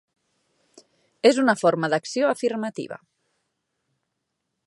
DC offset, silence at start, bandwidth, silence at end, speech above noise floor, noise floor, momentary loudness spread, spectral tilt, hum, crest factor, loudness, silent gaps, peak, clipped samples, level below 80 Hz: under 0.1%; 1.25 s; 11.5 kHz; 1.7 s; 57 dB; -79 dBFS; 16 LU; -4.5 dB/octave; none; 22 dB; -22 LUFS; none; -4 dBFS; under 0.1%; -78 dBFS